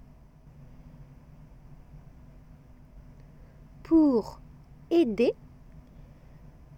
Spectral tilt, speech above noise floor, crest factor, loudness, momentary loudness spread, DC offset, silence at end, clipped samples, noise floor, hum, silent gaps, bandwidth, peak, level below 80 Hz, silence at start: -7.5 dB/octave; 29 dB; 18 dB; -25 LUFS; 29 LU; under 0.1%; 0.95 s; under 0.1%; -53 dBFS; none; none; 7.6 kHz; -12 dBFS; -54 dBFS; 1.95 s